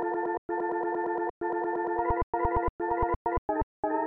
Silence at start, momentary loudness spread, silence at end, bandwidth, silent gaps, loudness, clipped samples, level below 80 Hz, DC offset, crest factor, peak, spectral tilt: 0 s; 3 LU; 0 s; 3.3 kHz; 0.38-0.49 s, 1.30-1.41 s, 2.23-2.33 s, 2.69-2.79 s, 3.16-3.25 s, 3.38-3.49 s, 3.63-3.83 s; -30 LUFS; under 0.1%; -42 dBFS; under 0.1%; 16 dB; -14 dBFS; -11 dB/octave